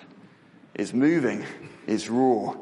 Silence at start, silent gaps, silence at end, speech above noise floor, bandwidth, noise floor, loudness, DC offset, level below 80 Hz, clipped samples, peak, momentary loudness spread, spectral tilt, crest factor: 0 s; none; 0 s; 29 dB; 11.5 kHz; -53 dBFS; -25 LUFS; under 0.1%; -70 dBFS; under 0.1%; -12 dBFS; 17 LU; -6 dB/octave; 16 dB